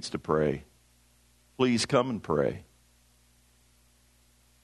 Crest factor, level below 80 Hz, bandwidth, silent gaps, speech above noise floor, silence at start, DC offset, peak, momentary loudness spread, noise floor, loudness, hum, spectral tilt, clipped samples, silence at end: 22 dB; -58 dBFS; 12 kHz; none; 36 dB; 0 s; under 0.1%; -10 dBFS; 8 LU; -64 dBFS; -28 LUFS; 60 Hz at -55 dBFS; -5 dB/octave; under 0.1%; 2 s